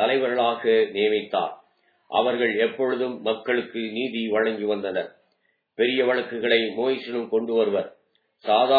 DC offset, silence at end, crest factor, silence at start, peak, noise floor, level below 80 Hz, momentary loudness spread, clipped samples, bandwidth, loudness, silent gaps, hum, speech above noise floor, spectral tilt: under 0.1%; 0 s; 18 dB; 0 s; -6 dBFS; -70 dBFS; -80 dBFS; 7 LU; under 0.1%; 4.9 kHz; -24 LUFS; none; none; 47 dB; -7.5 dB/octave